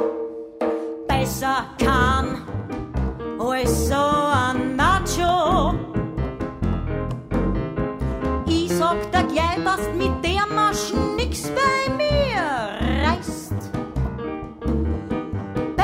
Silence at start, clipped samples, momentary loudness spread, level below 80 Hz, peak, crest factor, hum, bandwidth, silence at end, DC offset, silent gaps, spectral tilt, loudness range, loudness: 0 s; under 0.1%; 9 LU; -32 dBFS; -6 dBFS; 16 dB; none; 16 kHz; 0 s; under 0.1%; none; -5 dB/octave; 4 LU; -22 LUFS